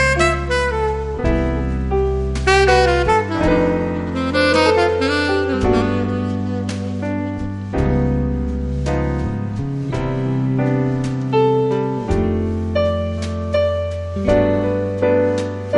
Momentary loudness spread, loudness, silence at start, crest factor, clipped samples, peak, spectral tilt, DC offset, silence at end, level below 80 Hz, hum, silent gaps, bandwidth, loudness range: 8 LU; -18 LUFS; 0 s; 16 dB; under 0.1%; 0 dBFS; -6.5 dB/octave; under 0.1%; 0 s; -28 dBFS; none; none; 11.5 kHz; 5 LU